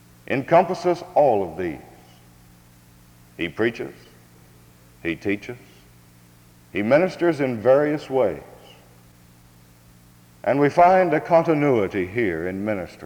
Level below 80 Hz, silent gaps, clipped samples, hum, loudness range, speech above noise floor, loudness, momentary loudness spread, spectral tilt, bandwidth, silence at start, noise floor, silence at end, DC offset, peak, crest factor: -58 dBFS; none; under 0.1%; none; 11 LU; 31 dB; -21 LUFS; 13 LU; -7 dB/octave; 20 kHz; 0.3 s; -51 dBFS; 0 s; under 0.1%; -4 dBFS; 18 dB